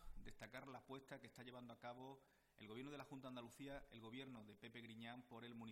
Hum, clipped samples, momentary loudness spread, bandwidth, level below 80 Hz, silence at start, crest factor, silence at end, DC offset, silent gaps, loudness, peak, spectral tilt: none; under 0.1%; 4 LU; 16 kHz; -70 dBFS; 0 s; 16 dB; 0 s; under 0.1%; none; -58 LUFS; -42 dBFS; -5.5 dB/octave